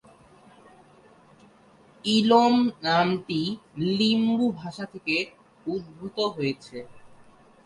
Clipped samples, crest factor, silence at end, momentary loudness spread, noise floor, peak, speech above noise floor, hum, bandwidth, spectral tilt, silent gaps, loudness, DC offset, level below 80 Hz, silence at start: under 0.1%; 20 dB; 0.6 s; 17 LU; -55 dBFS; -6 dBFS; 31 dB; none; 11 kHz; -5.5 dB/octave; none; -25 LUFS; under 0.1%; -64 dBFS; 2.05 s